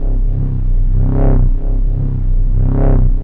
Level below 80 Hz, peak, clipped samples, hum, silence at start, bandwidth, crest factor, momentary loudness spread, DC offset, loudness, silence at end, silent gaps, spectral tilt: -12 dBFS; -2 dBFS; under 0.1%; none; 0 s; 2 kHz; 8 dB; 5 LU; 2%; -17 LUFS; 0 s; none; -12.5 dB/octave